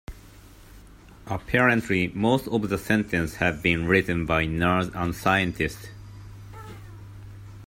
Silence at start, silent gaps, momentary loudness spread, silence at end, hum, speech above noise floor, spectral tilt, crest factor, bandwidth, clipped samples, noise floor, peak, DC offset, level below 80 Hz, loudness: 0.1 s; none; 23 LU; 0.05 s; none; 24 dB; -6 dB/octave; 20 dB; 16.5 kHz; under 0.1%; -48 dBFS; -6 dBFS; under 0.1%; -46 dBFS; -24 LUFS